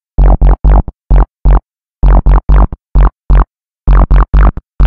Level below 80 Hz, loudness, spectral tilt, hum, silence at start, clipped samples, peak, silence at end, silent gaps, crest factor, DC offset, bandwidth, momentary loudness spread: -8 dBFS; -11 LUFS; -10.5 dB/octave; none; 0.2 s; under 0.1%; 0 dBFS; 0 s; none; 8 dB; 3%; 3.1 kHz; 5 LU